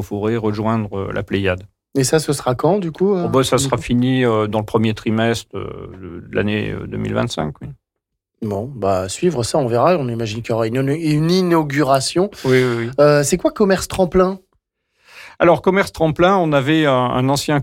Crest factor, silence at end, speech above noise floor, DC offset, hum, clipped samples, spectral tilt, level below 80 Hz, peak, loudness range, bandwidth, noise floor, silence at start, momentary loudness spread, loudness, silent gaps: 14 dB; 0 s; 62 dB; under 0.1%; none; under 0.1%; -5.5 dB/octave; -44 dBFS; -4 dBFS; 6 LU; 16.5 kHz; -79 dBFS; 0 s; 10 LU; -17 LUFS; none